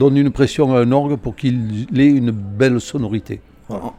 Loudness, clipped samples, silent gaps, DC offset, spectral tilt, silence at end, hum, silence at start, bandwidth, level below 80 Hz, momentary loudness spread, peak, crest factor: -17 LUFS; under 0.1%; none; under 0.1%; -7.5 dB/octave; 0.05 s; none; 0 s; 10 kHz; -42 dBFS; 13 LU; -2 dBFS; 14 dB